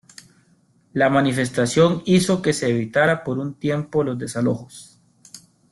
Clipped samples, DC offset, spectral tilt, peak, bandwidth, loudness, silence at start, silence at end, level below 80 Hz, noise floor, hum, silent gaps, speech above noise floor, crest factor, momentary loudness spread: under 0.1%; under 0.1%; -5.5 dB/octave; -4 dBFS; 12.5 kHz; -20 LUFS; 0.95 s; 0.35 s; -56 dBFS; -59 dBFS; none; none; 39 dB; 18 dB; 8 LU